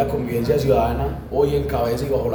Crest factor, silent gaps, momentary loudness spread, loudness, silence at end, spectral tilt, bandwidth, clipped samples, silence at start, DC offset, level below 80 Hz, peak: 16 dB; none; 5 LU; -21 LUFS; 0 s; -7.5 dB/octave; over 20 kHz; under 0.1%; 0 s; under 0.1%; -32 dBFS; -4 dBFS